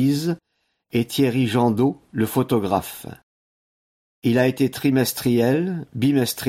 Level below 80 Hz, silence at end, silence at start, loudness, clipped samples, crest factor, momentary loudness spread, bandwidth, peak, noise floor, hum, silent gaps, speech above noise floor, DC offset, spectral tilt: -58 dBFS; 0 s; 0 s; -21 LUFS; under 0.1%; 16 dB; 8 LU; 16.5 kHz; -6 dBFS; under -90 dBFS; none; 3.23-4.22 s; over 70 dB; under 0.1%; -6 dB/octave